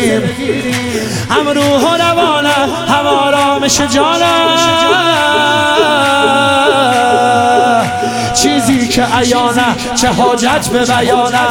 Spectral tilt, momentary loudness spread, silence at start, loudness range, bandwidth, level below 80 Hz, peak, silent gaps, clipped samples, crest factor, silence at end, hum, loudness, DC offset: -3.5 dB/octave; 4 LU; 0 s; 2 LU; 17.5 kHz; -40 dBFS; 0 dBFS; none; under 0.1%; 10 dB; 0 s; none; -10 LUFS; under 0.1%